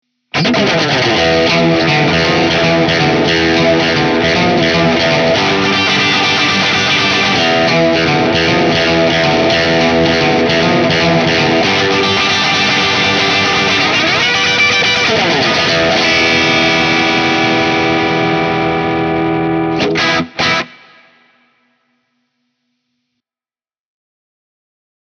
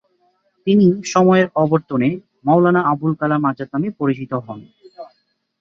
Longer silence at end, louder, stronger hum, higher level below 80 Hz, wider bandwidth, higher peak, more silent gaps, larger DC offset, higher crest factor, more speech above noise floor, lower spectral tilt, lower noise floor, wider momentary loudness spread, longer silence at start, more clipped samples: first, 4.35 s vs 0.55 s; first, -11 LUFS vs -17 LUFS; neither; first, -42 dBFS vs -60 dBFS; first, 9.6 kHz vs 7.6 kHz; about the same, 0 dBFS vs -2 dBFS; neither; neither; about the same, 12 dB vs 16 dB; first, over 79 dB vs 48 dB; second, -4 dB/octave vs -7 dB/octave; first, under -90 dBFS vs -64 dBFS; second, 4 LU vs 12 LU; second, 0.35 s vs 0.65 s; neither